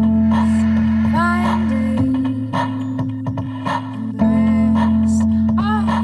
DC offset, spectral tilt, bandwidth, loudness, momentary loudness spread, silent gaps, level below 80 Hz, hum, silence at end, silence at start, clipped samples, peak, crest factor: under 0.1%; -7.5 dB/octave; 10 kHz; -17 LUFS; 8 LU; none; -38 dBFS; none; 0 s; 0 s; under 0.1%; -4 dBFS; 12 dB